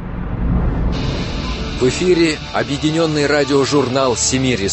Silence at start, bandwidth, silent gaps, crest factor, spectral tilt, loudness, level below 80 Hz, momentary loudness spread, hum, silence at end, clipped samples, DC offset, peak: 0 s; 8.6 kHz; none; 14 dB; -4.5 dB/octave; -17 LUFS; -26 dBFS; 8 LU; none; 0 s; under 0.1%; under 0.1%; -2 dBFS